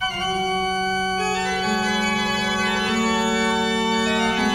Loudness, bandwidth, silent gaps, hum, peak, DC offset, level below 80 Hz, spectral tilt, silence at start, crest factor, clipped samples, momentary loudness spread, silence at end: -21 LUFS; 16 kHz; none; none; -8 dBFS; under 0.1%; -46 dBFS; -3.5 dB/octave; 0 s; 12 dB; under 0.1%; 2 LU; 0 s